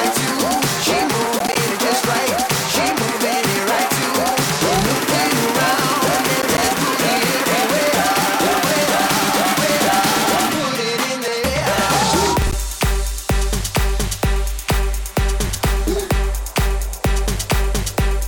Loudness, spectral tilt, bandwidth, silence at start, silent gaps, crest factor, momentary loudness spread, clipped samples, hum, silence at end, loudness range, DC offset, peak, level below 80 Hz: -17 LUFS; -3.5 dB/octave; 19.5 kHz; 0 s; none; 10 dB; 5 LU; under 0.1%; none; 0 s; 5 LU; under 0.1%; -8 dBFS; -24 dBFS